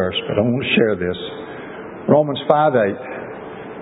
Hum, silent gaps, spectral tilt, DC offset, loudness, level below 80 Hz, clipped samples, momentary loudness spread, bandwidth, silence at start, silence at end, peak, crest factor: none; none; -9.5 dB/octave; under 0.1%; -18 LUFS; -48 dBFS; under 0.1%; 16 LU; 4 kHz; 0 s; 0 s; 0 dBFS; 20 dB